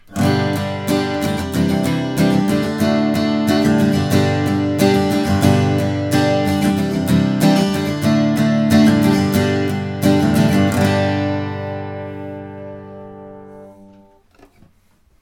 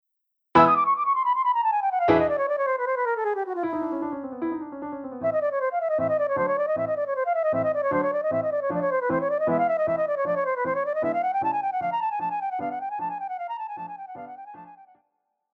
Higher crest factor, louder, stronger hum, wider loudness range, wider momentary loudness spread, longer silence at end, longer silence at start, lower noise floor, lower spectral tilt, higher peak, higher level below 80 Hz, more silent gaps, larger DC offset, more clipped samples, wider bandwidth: second, 16 dB vs 22 dB; first, -16 LUFS vs -25 LUFS; neither; first, 10 LU vs 6 LU; about the same, 14 LU vs 12 LU; first, 1.5 s vs 0.7 s; second, 0.1 s vs 0.55 s; second, -55 dBFS vs -79 dBFS; second, -6.5 dB/octave vs -8 dB/octave; first, 0 dBFS vs -4 dBFS; first, -46 dBFS vs -62 dBFS; neither; neither; neither; first, 17.5 kHz vs 6.2 kHz